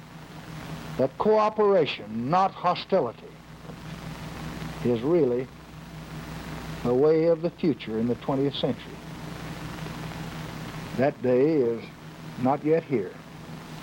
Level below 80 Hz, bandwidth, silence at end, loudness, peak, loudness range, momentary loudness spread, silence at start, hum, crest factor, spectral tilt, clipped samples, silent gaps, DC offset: -52 dBFS; 17 kHz; 0 s; -26 LUFS; -10 dBFS; 5 LU; 19 LU; 0 s; none; 18 dB; -7 dB/octave; under 0.1%; none; under 0.1%